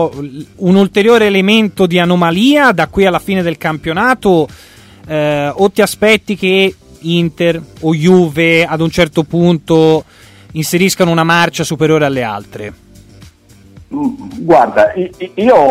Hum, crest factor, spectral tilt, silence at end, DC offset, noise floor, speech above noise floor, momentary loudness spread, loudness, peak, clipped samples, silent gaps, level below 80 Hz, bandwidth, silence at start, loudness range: none; 12 dB; -5.5 dB/octave; 0 s; under 0.1%; -41 dBFS; 30 dB; 11 LU; -11 LUFS; 0 dBFS; under 0.1%; none; -42 dBFS; 16 kHz; 0 s; 5 LU